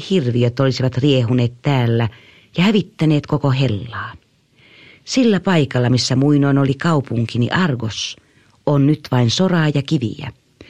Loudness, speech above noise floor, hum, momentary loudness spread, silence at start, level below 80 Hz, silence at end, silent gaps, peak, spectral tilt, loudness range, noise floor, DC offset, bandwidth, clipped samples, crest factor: -17 LUFS; 37 dB; none; 10 LU; 0 s; -50 dBFS; 0.05 s; none; -2 dBFS; -6.5 dB/octave; 2 LU; -53 dBFS; under 0.1%; 9.8 kHz; under 0.1%; 14 dB